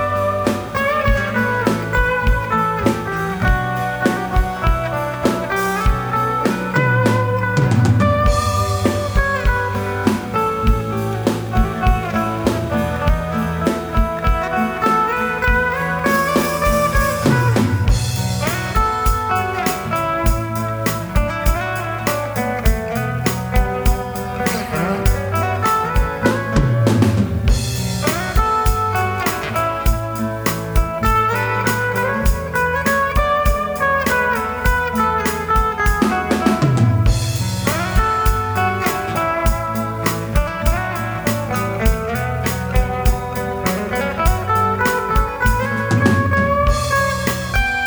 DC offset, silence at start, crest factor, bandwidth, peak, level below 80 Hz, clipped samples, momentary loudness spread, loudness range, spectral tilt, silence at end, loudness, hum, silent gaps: under 0.1%; 0 s; 16 dB; over 20 kHz; -2 dBFS; -24 dBFS; under 0.1%; 5 LU; 3 LU; -5.5 dB/octave; 0 s; -18 LUFS; none; none